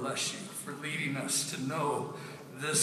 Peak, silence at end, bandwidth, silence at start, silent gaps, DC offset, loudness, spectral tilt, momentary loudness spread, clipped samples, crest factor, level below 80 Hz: -14 dBFS; 0 s; 15.5 kHz; 0 s; none; under 0.1%; -34 LUFS; -2.5 dB/octave; 10 LU; under 0.1%; 20 dB; -80 dBFS